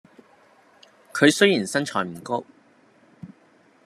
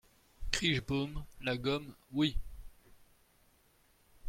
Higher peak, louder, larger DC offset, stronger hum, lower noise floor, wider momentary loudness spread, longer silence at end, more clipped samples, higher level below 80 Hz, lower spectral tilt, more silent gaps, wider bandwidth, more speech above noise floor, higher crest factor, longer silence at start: first, -2 dBFS vs -10 dBFS; first, -22 LUFS vs -35 LUFS; neither; neither; second, -57 dBFS vs -69 dBFS; about the same, 14 LU vs 14 LU; first, 0.6 s vs 0 s; neither; second, -74 dBFS vs -48 dBFS; about the same, -4 dB/octave vs -4.5 dB/octave; neither; second, 13.5 kHz vs 16.5 kHz; about the same, 36 dB vs 34 dB; about the same, 24 dB vs 28 dB; first, 1.15 s vs 0.4 s